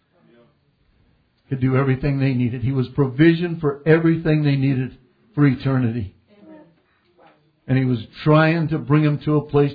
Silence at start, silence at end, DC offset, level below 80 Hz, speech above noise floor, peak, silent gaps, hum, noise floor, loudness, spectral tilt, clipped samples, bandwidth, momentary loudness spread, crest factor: 1.5 s; 0 s; under 0.1%; -48 dBFS; 43 dB; -2 dBFS; none; none; -61 dBFS; -19 LUFS; -11 dB/octave; under 0.1%; 5 kHz; 8 LU; 18 dB